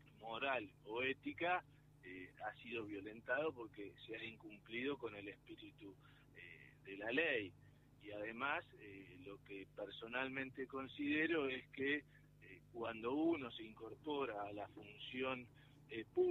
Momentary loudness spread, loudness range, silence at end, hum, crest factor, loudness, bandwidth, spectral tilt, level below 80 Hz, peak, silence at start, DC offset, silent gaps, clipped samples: 18 LU; 5 LU; 0 s; 50 Hz at -70 dBFS; 22 dB; -45 LUFS; 12.5 kHz; -6.5 dB/octave; -76 dBFS; -24 dBFS; 0 s; under 0.1%; none; under 0.1%